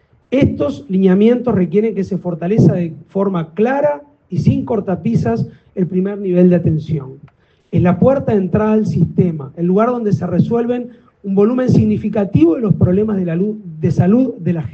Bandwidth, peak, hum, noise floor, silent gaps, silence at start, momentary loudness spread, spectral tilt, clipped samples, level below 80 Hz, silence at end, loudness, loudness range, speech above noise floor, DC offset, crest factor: 7 kHz; 0 dBFS; none; -38 dBFS; none; 0.3 s; 8 LU; -10 dB/octave; under 0.1%; -44 dBFS; 0 s; -15 LUFS; 2 LU; 24 dB; under 0.1%; 14 dB